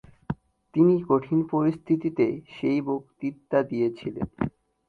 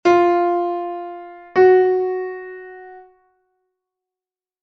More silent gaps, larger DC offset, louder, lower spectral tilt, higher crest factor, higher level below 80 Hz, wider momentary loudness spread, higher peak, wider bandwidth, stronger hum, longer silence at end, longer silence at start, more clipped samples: neither; neither; second, -26 LUFS vs -17 LUFS; first, -10 dB/octave vs -6 dB/octave; about the same, 18 dB vs 16 dB; first, -56 dBFS vs -62 dBFS; second, 13 LU vs 23 LU; second, -8 dBFS vs -2 dBFS; second, 4.8 kHz vs 6.2 kHz; neither; second, 0.4 s vs 1.65 s; first, 0.3 s vs 0.05 s; neither